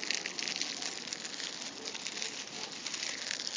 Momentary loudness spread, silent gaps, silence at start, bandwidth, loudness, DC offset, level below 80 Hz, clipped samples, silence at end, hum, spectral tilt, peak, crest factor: 5 LU; none; 0 s; 7.8 kHz; -36 LUFS; under 0.1%; -80 dBFS; under 0.1%; 0 s; none; 0.5 dB/octave; -12 dBFS; 28 dB